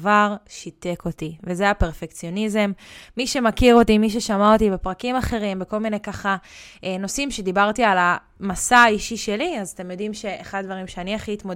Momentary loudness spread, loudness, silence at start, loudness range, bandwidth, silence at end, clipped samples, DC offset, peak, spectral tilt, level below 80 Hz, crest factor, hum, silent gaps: 15 LU; -21 LUFS; 0 s; 4 LU; 16.5 kHz; 0 s; under 0.1%; under 0.1%; -2 dBFS; -4.5 dB/octave; -38 dBFS; 18 dB; none; none